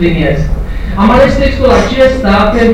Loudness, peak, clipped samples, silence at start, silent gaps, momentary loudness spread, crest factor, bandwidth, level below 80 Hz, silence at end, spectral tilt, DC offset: -9 LUFS; 0 dBFS; under 0.1%; 0 s; none; 10 LU; 8 dB; 13.5 kHz; -16 dBFS; 0 s; -6.5 dB/octave; under 0.1%